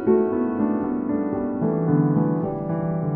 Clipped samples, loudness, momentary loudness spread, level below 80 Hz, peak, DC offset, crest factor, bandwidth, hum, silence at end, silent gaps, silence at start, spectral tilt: under 0.1%; -23 LUFS; 5 LU; -52 dBFS; -8 dBFS; under 0.1%; 14 dB; 2.8 kHz; none; 0 s; none; 0 s; -14.5 dB/octave